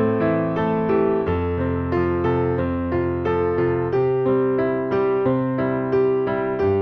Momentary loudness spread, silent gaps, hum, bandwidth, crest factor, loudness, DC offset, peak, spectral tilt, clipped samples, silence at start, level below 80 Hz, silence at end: 3 LU; none; none; 5.6 kHz; 12 dB; -21 LUFS; under 0.1%; -8 dBFS; -10.5 dB/octave; under 0.1%; 0 s; -42 dBFS; 0 s